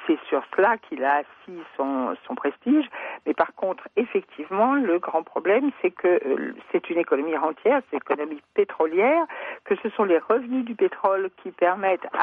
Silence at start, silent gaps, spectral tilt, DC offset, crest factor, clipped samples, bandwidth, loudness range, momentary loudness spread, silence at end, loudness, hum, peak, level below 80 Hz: 0 s; none; -8.5 dB/octave; under 0.1%; 18 dB; under 0.1%; 4.3 kHz; 2 LU; 8 LU; 0 s; -24 LUFS; none; -6 dBFS; -74 dBFS